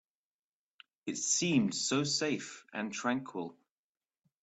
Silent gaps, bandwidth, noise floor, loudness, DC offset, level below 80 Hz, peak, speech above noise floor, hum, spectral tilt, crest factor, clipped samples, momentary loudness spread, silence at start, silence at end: none; 8.2 kHz; under -90 dBFS; -33 LUFS; under 0.1%; -76 dBFS; -18 dBFS; over 56 dB; none; -3 dB/octave; 18 dB; under 0.1%; 14 LU; 1.05 s; 0.9 s